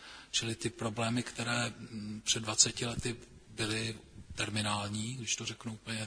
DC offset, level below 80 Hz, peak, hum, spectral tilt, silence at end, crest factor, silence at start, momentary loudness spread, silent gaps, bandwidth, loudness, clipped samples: under 0.1%; -60 dBFS; -10 dBFS; none; -2.5 dB/octave; 0 s; 26 dB; 0 s; 16 LU; none; 11 kHz; -34 LUFS; under 0.1%